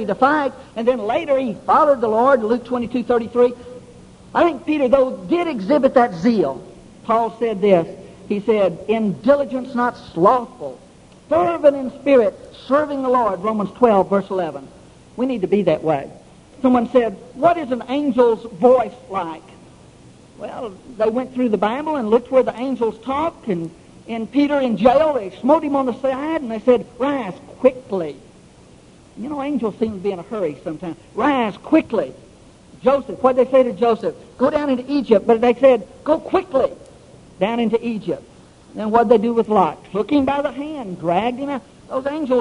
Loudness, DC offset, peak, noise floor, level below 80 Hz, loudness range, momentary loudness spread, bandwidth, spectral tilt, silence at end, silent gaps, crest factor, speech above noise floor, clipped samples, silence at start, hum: -19 LUFS; under 0.1%; 0 dBFS; -46 dBFS; -52 dBFS; 4 LU; 13 LU; 11 kHz; -7 dB/octave; 0 s; none; 18 dB; 28 dB; under 0.1%; 0 s; none